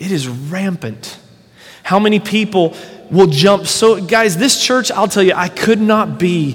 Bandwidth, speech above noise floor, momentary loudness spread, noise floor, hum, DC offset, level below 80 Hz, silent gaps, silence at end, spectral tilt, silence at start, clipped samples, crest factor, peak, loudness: 17.5 kHz; 30 dB; 11 LU; -43 dBFS; none; under 0.1%; -54 dBFS; none; 0 s; -4.5 dB/octave; 0 s; 0.1%; 14 dB; 0 dBFS; -13 LUFS